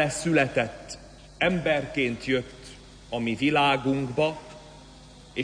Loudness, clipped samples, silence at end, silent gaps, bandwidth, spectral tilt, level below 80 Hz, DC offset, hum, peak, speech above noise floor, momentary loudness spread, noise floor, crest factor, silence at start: -25 LUFS; under 0.1%; 0 s; none; 10.5 kHz; -5 dB/octave; -52 dBFS; under 0.1%; 50 Hz at -50 dBFS; -10 dBFS; 23 dB; 20 LU; -48 dBFS; 18 dB; 0 s